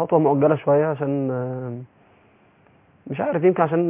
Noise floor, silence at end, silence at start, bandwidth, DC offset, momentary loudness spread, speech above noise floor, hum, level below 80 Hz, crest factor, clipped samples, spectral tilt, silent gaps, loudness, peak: -56 dBFS; 0 s; 0 s; 3.7 kHz; under 0.1%; 15 LU; 36 dB; none; -66 dBFS; 18 dB; under 0.1%; -12.5 dB/octave; none; -21 LUFS; -4 dBFS